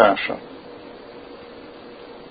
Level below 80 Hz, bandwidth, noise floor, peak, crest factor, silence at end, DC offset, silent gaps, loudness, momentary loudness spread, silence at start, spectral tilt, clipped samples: -58 dBFS; 5 kHz; -40 dBFS; 0 dBFS; 24 dB; 0.05 s; under 0.1%; none; -22 LUFS; 16 LU; 0 s; -9 dB/octave; under 0.1%